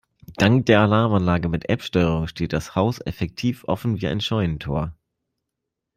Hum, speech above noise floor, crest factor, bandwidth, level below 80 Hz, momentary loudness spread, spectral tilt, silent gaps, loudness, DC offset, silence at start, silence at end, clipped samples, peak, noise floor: none; 61 dB; 18 dB; 15.5 kHz; -44 dBFS; 10 LU; -7 dB/octave; none; -22 LUFS; under 0.1%; 0.3 s; 1.05 s; under 0.1%; -4 dBFS; -82 dBFS